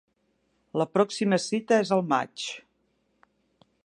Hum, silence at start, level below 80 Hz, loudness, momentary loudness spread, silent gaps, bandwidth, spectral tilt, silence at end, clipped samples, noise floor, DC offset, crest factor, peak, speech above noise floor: none; 0.75 s; -76 dBFS; -26 LUFS; 12 LU; none; 11 kHz; -5 dB/octave; 1.25 s; under 0.1%; -72 dBFS; under 0.1%; 20 dB; -8 dBFS; 47 dB